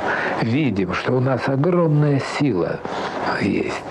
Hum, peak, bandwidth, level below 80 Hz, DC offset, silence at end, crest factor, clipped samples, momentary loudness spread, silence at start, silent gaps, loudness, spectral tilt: none; -6 dBFS; 10 kHz; -52 dBFS; under 0.1%; 0 s; 14 dB; under 0.1%; 7 LU; 0 s; none; -20 LUFS; -7.5 dB/octave